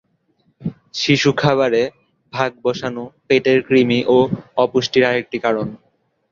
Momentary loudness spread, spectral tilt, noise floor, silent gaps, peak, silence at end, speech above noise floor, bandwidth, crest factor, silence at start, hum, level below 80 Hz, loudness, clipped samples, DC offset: 14 LU; -5.5 dB/octave; -62 dBFS; none; -2 dBFS; 0.55 s; 46 dB; 7.4 kHz; 16 dB; 0.6 s; none; -56 dBFS; -17 LUFS; under 0.1%; under 0.1%